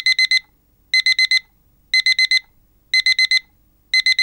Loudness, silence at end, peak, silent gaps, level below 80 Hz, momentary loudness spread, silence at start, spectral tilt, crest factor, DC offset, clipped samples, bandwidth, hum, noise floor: -15 LUFS; 0 s; -4 dBFS; none; -60 dBFS; 5 LU; 0 s; 4.5 dB/octave; 14 dB; under 0.1%; under 0.1%; 16 kHz; none; -57 dBFS